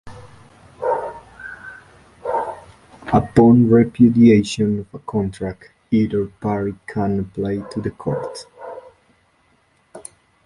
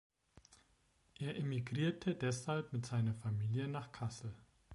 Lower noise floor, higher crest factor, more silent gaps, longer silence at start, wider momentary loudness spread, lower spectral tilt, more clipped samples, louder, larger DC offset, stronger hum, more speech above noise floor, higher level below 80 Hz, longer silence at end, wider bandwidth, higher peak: second, -60 dBFS vs -74 dBFS; about the same, 18 dB vs 16 dB; neither; second, 0.05 s vs 0.5 s; first, 24 LU vs 8 LU; about the same, -7.5 dB/octave vs -6.5 dB/octave; neither; first, -18 LUFS vs -40 LUFS; neither; neither; first, 43 dB vs 35 dB; first, -46 dBFS vs -68 dBFS; first, 0.45 s vs 0 s; about the same, 11.5 kHz vs 11.5 kHz; first, -2 dBFS vs -26 dBFS